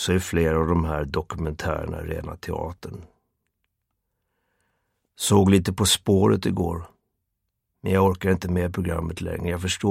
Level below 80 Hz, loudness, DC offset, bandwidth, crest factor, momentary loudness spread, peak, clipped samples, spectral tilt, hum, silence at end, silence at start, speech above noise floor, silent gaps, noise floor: -40 dBFS; -23 LUFS; under 0.1%; 16.5 kHz; 20 dB; 13 LU; -4 dBFS; under 0.1%; -5 dB/octave; none; 0 s; 0 s; 56 dB; none; -79 dBFS